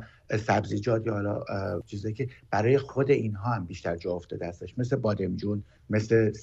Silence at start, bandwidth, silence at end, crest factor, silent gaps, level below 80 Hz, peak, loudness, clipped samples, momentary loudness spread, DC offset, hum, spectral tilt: 0 s; 7.8 kHz; 0 s; 18 dB; none; -56 dBFS; -10 dBFS; -29 LUFS; under 0.1%; 9 LU; under 0.1%; none; -7.5 dB/octave